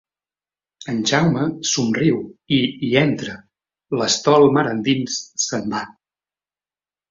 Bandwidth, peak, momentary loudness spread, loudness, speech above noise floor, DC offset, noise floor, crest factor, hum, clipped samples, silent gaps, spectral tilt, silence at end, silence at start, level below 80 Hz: 7.8 kHz; -2 dBFS; 13 LU; -19 LUFS; over 71 dB; under 0.1%; under -90 dBFS; 18 dB; none; under 0.1%; none; -4.5 dB/octave; 1.2 s; 0.8 s; -58 dBFS